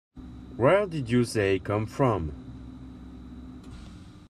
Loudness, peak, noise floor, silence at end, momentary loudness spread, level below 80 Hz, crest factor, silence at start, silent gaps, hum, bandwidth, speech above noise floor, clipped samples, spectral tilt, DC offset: -26 LUFS; -8 dBFS; -46 dBFS; 0.1 s; 22 LU; -48 dBFS; 20 dB; 0.15 s; none; none; 13 kHz; 21 dB; under 0.1%; -6.5 dB/octave; under 0.1%